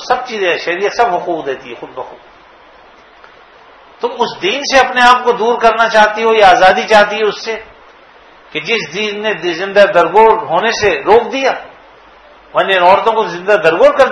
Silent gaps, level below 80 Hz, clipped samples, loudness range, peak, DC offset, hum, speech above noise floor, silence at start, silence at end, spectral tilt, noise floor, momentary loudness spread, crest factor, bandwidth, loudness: none; -46 dBFS; 0.8%; 10 LU; 0 dBFS; under 0.1%; none; 30 dB; 0 s; 0 s; -3 dB/octave; -41 dBFS; 14 LU; 12 dB; 12 kHz; -11 LUFS